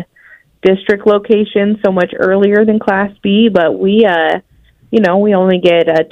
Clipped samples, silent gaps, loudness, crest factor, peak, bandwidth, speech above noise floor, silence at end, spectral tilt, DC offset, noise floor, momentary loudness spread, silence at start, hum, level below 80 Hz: 0.1%; none; -11 LUFS; 12 dB; 0 dBFS; 6.4 kHz; 33 dB; 0.05 s; -8 dB/octave; under 0.1%; -44 dBFS; 5 LU; 0 s; none; -50 dBFS